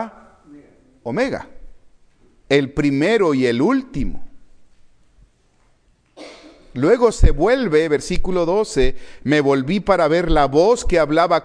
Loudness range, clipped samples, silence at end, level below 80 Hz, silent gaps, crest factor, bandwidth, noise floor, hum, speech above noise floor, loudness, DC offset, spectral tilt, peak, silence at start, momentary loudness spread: 6 LU; under 0.1%; 0 s; -28 dBFS; none; 18 dB; 10.5 kHz; -58 dBFS; none; 42 dB; -18 LUFS; under 0.1%; -6 dB/octave; 0 dBFS; 0 s; 13 LU